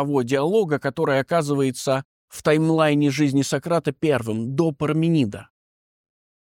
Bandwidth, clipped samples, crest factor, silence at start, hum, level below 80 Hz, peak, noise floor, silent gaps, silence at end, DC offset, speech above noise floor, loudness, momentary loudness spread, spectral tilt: 16.5 kHz; under 0.1%; 16 dB; 0 s; none; -60 dBFS; -6 dBFS; under -90 dBFS; 2.05-2.28 s; 1.15 s; under 0.1%; over 69 dB; -21 LUFS; 6 LU; -6 dB/octave